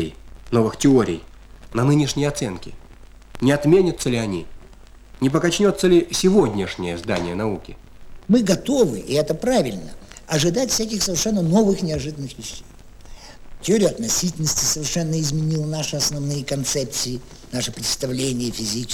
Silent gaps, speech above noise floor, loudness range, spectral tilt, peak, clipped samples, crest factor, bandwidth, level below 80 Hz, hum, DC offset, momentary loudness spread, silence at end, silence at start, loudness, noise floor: none; 23 dB; 3 LU; -4.5 dB/octave; -2 dBFS; under 0.1%; 18 dB; 20 kHz; -42 dBFS; none; under 0.1%; 13 LU; 0 s; 0 s; -20 LUFS; -43 dBFS